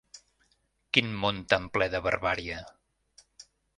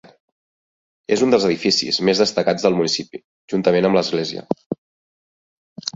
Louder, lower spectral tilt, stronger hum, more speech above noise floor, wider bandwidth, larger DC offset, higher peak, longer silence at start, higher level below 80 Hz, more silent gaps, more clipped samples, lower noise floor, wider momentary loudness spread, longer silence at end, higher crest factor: second, -28 LUFS vs -18 LUFS; about the same, -4.5 dB/octave vs -4.5 dB/octave; neither; second, 43 dB vs over 72 dB; first, 11.5 kHz vs 8 kHz; neither; about the same, -4 dBFS vs -2 dBFS; second, 0.15 s vs 1.1 s; first, -54 dBFS vs -60 dBFS; second, none vs 3.24-3.48 s, 4.66-4.70 s, 4.78-5.76 s; neither; second, -72 dBFS vs under -90 dBFS; second, 8 LU vs 15 LU; first, 0.35 s vs 0.05 s; first, 28 dB vs 18 dB